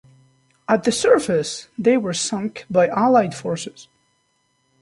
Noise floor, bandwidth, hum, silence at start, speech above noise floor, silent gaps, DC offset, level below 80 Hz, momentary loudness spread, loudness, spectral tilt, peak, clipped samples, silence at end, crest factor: -67 dBFS; 11.5 kHz; none; 0.7 s; 48 dB; none; under 0.1%; -60 dBFS; 12 LU; -19 LUFS; -4.5 dB/octave; -2 dBFS; under 0.1%; 1 s; 18 dB